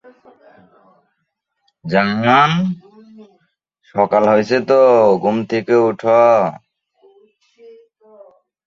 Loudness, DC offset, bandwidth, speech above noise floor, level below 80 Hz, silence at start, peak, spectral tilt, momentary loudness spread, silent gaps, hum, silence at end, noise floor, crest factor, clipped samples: -14 LUFS; under 0.1%; 7.4 kHz; 59 dB; -60 dBFS; 1.85 s; -2 dBFS; -7 dB/octave; 11 LU; none; none; 2.1 s; -73 dBFS; 16 dB; under 0.1%